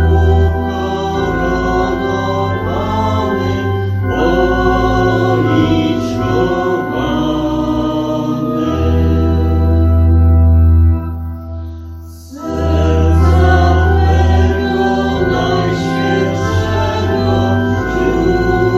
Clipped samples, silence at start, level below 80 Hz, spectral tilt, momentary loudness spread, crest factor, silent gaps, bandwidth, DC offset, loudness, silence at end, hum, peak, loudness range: under 0.1%; 0 s; -20 dBFS; -7.5 dB/octave; 7 LU; 12 dB; none; 7.2 kHz; under 0.1%; -14 LUFS; 0 s; none; 0 dBFS; 3 LU